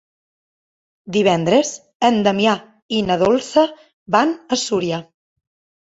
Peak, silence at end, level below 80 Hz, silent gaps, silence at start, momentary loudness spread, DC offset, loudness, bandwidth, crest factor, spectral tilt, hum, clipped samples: -2 dBFS; 0.9 s; -58 dBFS; 1.95-2.00 s, 2.82-2.89 s, 3.93-4.06 s; 1.05 s; 8 LU; under 0.1%; -18 LUFS; 8 kHz; 18 dB; -4.5 dB/octave; none; under 0.1%